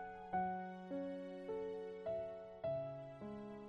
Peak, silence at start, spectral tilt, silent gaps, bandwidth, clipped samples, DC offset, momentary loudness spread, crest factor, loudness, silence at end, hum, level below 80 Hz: -30 dBFS; 0 s; -8.5 dB/octave; none; 8.6 kHz; under 0.1%; under 0.1%; 8 LU; 16 dB; -46 LUFS; 0 s; none; -74 dBFS